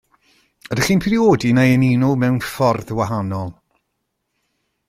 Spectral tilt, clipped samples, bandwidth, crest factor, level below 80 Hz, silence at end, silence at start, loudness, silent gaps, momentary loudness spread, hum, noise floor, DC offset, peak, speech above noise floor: -6.5 dB/octave; under 0.1%; 15.5 kHz; 16 dB; -48 dBFS; 1.35 s; 0.65 s; -17 LUFS; none; 11 LU; none; -74 dBFS; under 0.1%; -2 dBFS; 58 dB